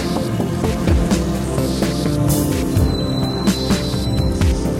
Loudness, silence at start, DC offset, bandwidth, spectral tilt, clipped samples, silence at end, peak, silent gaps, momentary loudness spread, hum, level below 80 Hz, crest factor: -18 LUFS; 0 s; under 0.1%; 16.5 kHz; -6 dB/octave; under 0.1%; 0 s; -4 dBFS; none; 3 LU; none; -24 dBFS; 14 dB